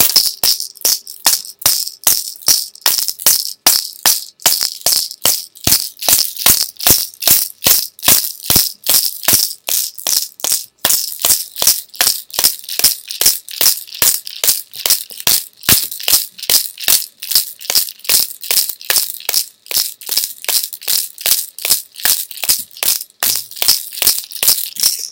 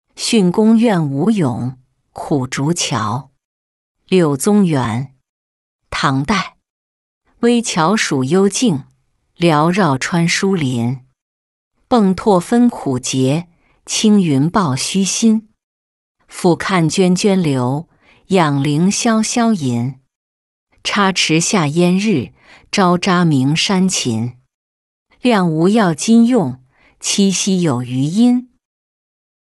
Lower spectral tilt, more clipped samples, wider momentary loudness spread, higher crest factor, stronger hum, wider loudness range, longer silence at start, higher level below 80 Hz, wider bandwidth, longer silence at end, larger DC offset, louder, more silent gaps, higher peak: second, 1 dB/octave vs -5 dB/octave; first, 0.5% vs under 0.1%; second, 5 LU vs 9 LU; about the same, 16 dB vs 14 dB; neither; about the same, 4 LU vs 3 LU; second, 0 s vs 0.15 s; first, -46 dBFS vs -52 dBFS; first, over 20 kHz vs 12 kHz; second, 0 s vs 1.1 s; neither; first, -12 LUFS vs -15 LUFS; second, none vs 3.45-3.95 s, 5.29-5.79 s, 6.70-7.21 s, 11.21-11.71 s, 15.63-16.15 s, 20.15-20.67 s, 24.54-25.06 s; about the same, 0 dBFS vs -2 dBFS